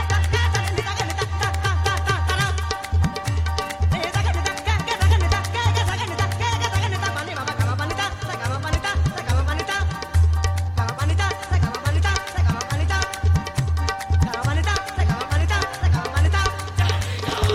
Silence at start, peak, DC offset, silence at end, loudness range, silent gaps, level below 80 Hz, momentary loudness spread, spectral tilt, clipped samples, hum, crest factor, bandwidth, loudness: 0 s; -4 dBFS; under 0.1%; 0 s; 2 LU; none; -28 dBFS; 4 LU; -4.5 dB/octave; under 0.1%; none; 16 dB; 14.5 kHz; -22 LUFS